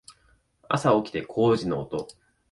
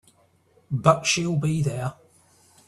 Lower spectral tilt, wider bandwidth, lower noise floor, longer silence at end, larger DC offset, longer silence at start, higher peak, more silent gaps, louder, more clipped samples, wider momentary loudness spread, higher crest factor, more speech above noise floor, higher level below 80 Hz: first, -6.5 dB/octave vs -4.5 dB/octave; about the same, 11.5 kHz vs 12.5 kHz; about the same, -64 dBFS vs -61 dBFS; second, 0.4 s vs 0.75 s; neither; second, 0.1 s vs 0.7 s; second, -6 dBFS vs -2 dBFS; neither; about the same, -25 LUFS vs -23 LUFS; neither; about the same, 12 LU vs 12 LU; about the same, 20 dB vs 24 dB; about the same, 39 dB vs 39 dB; about the same, -58 dBFS vs -58 dBFS